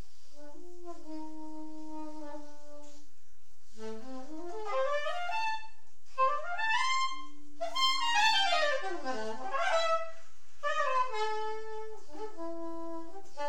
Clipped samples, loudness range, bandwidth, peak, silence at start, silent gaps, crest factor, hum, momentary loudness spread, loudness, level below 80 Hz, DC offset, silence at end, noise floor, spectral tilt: under 0.1%; 17 LU; 17 kHz; -16 dBFS; 0.35 s; none; 18 dB; none; 21 LU; -32 LUFS; -70 dBFS; 3%; 0 s; -66 dBFS; -2 dB/octave